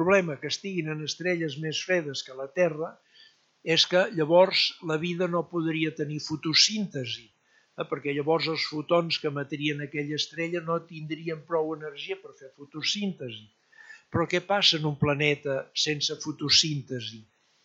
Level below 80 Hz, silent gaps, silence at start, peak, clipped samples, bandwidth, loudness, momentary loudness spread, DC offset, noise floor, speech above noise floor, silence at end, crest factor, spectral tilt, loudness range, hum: -66 dBFS; none; 0 s; -8 dBFS; under 0.1%; 8 kHz; -27 LUFS; 15 LU; under 0.1%; -58 dBFS; 31 dB; 0.4 s; 20 dB; -3.5 dB/octave; 7 LU; none